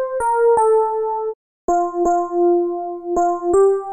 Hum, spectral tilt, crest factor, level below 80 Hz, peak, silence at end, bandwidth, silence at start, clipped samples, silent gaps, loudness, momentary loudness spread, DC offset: none; -7 dB/octave; 10 dB; -50 dBFS; -8 dBFS; 0 s; 10.5 kHz; 0 s; under 0.1%; 1.35-1.68 s; -18 LUFS; 9 LU; under 0.1%